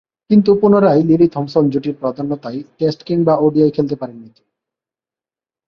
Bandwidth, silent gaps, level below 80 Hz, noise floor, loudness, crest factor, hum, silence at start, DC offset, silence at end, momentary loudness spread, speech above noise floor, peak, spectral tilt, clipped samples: 6.4 kHz; none; -54 dBFS; under -90 dBFS; -15 LUFS; 14 dB; none; 0.3 s; under 0.1%; 1.45 s; 12 LU; over 76 dB; 0 dBFS; -9.5 dB/octave; under 0.1%